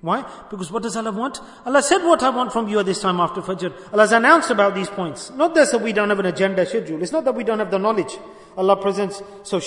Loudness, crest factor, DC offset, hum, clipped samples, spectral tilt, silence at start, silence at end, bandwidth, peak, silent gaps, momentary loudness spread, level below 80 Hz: -19 LUFS; 20 dB; under 0.1%; none; under 0.1%; -4 dB/octave; 0.05 s; 0 s; 11 kHz; 0 dBFS; none; 13 LU; -60 dBFS